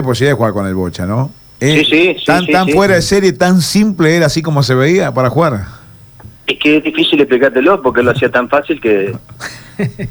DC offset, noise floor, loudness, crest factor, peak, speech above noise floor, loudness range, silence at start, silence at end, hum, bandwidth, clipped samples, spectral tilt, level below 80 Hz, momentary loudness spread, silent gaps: under 0.1%; -37 dBFS; -12 LUFS; 12 dB; 0 dBFS; 25 dB; 2 LU; 0 s; 0 s; none; over 20 kHz; under 0.1%; -5.5 dB/octave; -40 dBFS; 11 LU; none